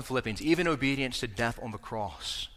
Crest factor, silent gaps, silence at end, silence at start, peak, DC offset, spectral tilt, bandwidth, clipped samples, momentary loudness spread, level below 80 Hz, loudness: 18 dB; none; 0 s; 0 s; -12 dBFS; under 0.1%; -4.5 dB/octave; 15.5 kHz; under 0.1%; 10 LU; -50 dBFS; -31 LUFS